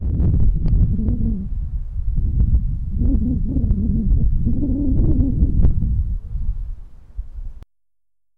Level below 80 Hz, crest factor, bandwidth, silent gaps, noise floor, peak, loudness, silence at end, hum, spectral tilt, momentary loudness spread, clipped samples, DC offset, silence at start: -20 dBFS; 10 dB; 1.4 kHz; none; -87 dBFS; -8 dBFS; -21 LUFS; 0.75 s; none; -13 dB/octave; 17 LU; under 0.1%; under 0.1%; 0 s